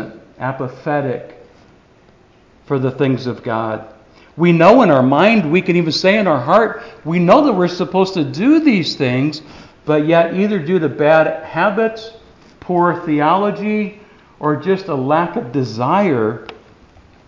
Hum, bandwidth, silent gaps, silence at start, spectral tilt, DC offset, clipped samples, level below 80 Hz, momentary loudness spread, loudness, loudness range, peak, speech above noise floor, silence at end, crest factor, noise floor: none; 7.6 kHz; none; 0 s; -7 dB/octave; under 0.1%; under 0.1%; -54 dBFS; 13 LU; -15 LUFS; 9 LU; 0 dBFS; 34 dB; 0.75 s; 16 dB; -49 dBFS